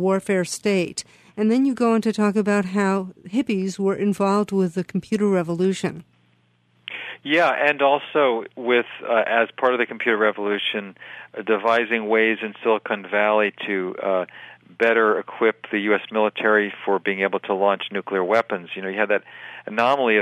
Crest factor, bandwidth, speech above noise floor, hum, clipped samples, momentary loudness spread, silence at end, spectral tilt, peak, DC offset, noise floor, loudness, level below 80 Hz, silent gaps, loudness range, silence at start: 18 dB; 13.5 kHz; 41 dB; none; under 0.1%; 10 LU; 0 s; -5.5 dB/octave; -4 dBFS; under 0.1%; -62 dBFS; -21 LUFS; -70 dBFS; none; 2 LU; 0 s